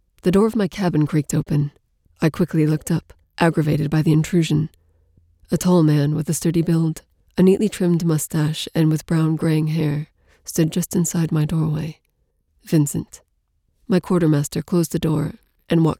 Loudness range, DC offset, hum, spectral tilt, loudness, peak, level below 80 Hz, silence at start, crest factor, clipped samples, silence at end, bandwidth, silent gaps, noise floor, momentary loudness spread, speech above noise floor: 3 LU; under 0.1%; none; -6.5 dB/octave; -20 LUFS; -4 dBFS; -48 dBFS; 0.25 s; 16 dB; under 0.1%; 0.05 s; 16 kHz; none; -67 dBFS; 9 LU; 48 dB